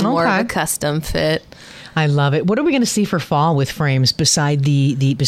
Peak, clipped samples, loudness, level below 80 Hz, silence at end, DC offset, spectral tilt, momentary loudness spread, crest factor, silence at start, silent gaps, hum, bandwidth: -4 dBFS; under 0.1%; -17 LUFS; -42 dBFS; 0 s; under 0.1%; -5 dB/octave; 5 LU; 12 dB; 0 s; none; none; 15 kHz